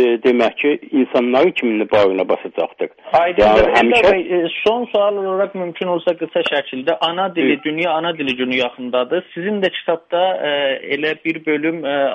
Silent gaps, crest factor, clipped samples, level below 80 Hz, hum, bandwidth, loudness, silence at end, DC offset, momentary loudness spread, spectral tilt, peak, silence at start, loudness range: none; 16 dB; under 0.1%; -46 dBFS; none; 9 kHz; -17 LUFS; 0 s; under 0.1%; 9 LU; -5.5 dB/octave; 0 dBFS; 0 s; 4 LU